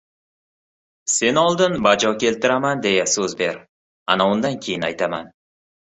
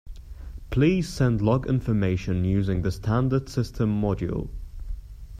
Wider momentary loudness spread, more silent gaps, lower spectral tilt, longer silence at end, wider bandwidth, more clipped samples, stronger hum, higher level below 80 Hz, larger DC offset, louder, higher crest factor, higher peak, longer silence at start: second, 8 LU vs 19 LU; first, 3.68-4.06 s vs none; second, -3 dB/octave vs -8 dB/octave; first, 0.7 s vs 0 s; second, 8.4 kHz vs 14 kHz; neither; neither; second, -58 dBFS vs -38 dBFS; neither; first, -19 LUFS vs -25 LUFS; about the same, 20 dB vs 16 dB; first, -2 dBFS vs -8 dBFS; first, 1.05 s vs 0.05 s